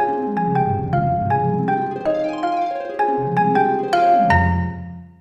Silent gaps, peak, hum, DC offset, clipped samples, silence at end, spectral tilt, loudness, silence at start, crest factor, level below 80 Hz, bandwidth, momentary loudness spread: none; -4 dBFS; none; under 0.1%; under 0.1%; 0.15 s; -8 dB/octave; -19 LUFS; 0 s; 16 dB; -40 dBFS; 10 kHz; 8 LU